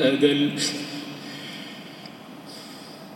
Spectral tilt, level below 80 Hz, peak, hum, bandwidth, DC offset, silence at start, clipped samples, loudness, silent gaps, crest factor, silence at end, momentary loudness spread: -4 dB/octave; -82 dBFS; -6 dBFS; none; 17 kHz; under 0.1%; 0 s; under 0.1%; -25 LUFS; none; 20 dB; 0 s; 20 LU